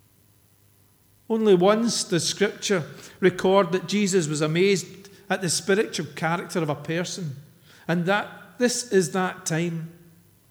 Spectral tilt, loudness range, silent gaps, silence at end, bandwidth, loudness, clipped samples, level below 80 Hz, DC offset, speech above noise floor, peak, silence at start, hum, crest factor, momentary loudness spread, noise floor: -4.5 dB/octave; 4 LU; none; 0.6 s; over 20 kHz; -24 LUFS; under 0.1%; -68 dBFS; under 0.1%; 36 dB; -6 dBFS; 1.3 s; none; 20 dB; 12 LU; -59 dBFS